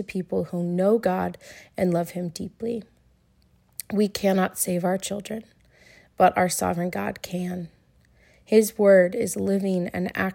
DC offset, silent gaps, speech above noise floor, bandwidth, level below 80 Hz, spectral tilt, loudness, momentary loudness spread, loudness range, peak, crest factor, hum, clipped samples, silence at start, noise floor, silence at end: under 0.1%; none; 38 dB; 16.5 kHz; -58 dBFS; -5.5 dB/octave; -24 LUFS; 15 LU; 4 LU; -4 dBFS; 20 dB; none; under 0.1%; 0 s; -61 dBFS; 0 s